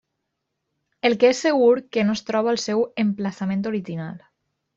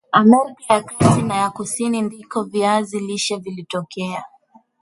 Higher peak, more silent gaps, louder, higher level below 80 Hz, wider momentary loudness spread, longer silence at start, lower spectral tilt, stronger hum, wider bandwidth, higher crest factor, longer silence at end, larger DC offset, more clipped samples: second, -4 dBFS vs 0 dBFS; neither; about the same, -21 LUFS vs -19 LUFS; second, -66 dBFS vs -50 dBFS; second, 10 LU vs 13 LU; first, 1.05 s vs 0.1 s; about the same, -5.5 dB/octave vs -5 dB/octave; neither; second, 7.8 kHz vs 11.5 kHz; about the same, 18 dB vs 18 dB; about the same, 0.6 s vs 0.55 s; neither; neither